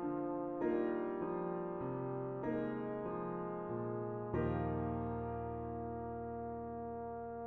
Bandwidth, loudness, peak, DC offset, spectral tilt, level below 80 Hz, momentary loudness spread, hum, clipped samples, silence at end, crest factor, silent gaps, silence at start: 4.1 kHz; -41 LUFS; -24 dBFS; under 0.1%; -9 dB/octave; -58 dBFS; 7 LU; none; under 0.1%; 0 s; 16 dB; none; 0 s